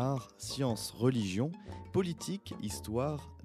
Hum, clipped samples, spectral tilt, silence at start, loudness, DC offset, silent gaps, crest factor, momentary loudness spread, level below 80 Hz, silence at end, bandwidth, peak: none; under 0.1%; -6 dB/octave; 0 s; -35 LUFS; under 0.1%; none; 18 dB; 8 LU; -58 dBFS; 0 s; 15.5 kHz; -16 dBFS